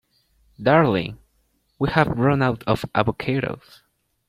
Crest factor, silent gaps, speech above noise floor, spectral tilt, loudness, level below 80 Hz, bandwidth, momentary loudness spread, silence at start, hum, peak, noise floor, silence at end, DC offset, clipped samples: 20 dB; none; 46 dB; -8 dB/octave; -21 LUFS; -48 dBFS; 14.5 kHz; 10 LU; 0.6 s; none; -2 dBFS; -66 dBFS; 0.7 s; under 0.1%; under 0.1%